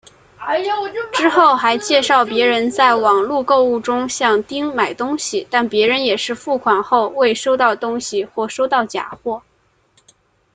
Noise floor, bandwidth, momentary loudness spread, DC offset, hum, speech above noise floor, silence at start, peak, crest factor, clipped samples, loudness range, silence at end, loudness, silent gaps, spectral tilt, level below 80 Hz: -59 dBFS; 9.6 kHz; 9 LU; under 0.1%; none; 43 dB; 0.4 s; -2 dBFS; 16 dB; under 0.1%; 4 LU; 1.15 s; -16 LUFS; none; -2.5 dB/octave; -60 dBFS